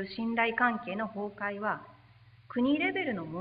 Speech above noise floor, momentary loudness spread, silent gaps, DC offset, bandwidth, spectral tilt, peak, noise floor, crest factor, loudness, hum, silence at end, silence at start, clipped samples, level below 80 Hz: 27 dB; 9 LU; none; under 0.1%; 5.2 kHz; -9 dB/octave; -14 dBFS; -58 dBFS; 18 dB; -31 LUFS; none; 0 s; 0 s; under 0.1%; -68 dBFS